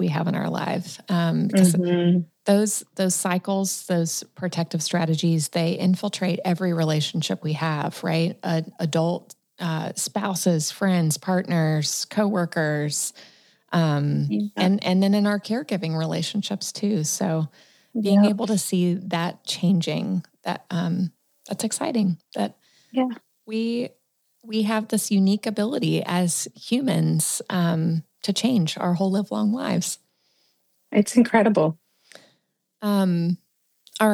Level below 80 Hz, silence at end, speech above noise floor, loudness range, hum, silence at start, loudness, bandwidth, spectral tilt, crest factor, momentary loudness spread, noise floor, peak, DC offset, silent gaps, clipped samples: -78 dBFS; 0 s; 48 dB; 4 LU; none; 0 s; -23 LUFS; 15.5 kHz; -5 dB/octave; 18 dB; 8 LU; -71 dBFS; -4 dBFS; under 0.1%; none; under 0.1%